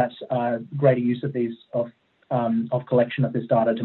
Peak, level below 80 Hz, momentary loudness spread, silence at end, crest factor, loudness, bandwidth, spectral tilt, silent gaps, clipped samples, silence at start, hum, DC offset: -4 dBFS; -66 dBFS; 8 LU; 0 s; 18 dB; -24 LUFS; 4.2 kHz; -11.5 dB/octave; none; under 0.1%; 0 s; none; under 0.1%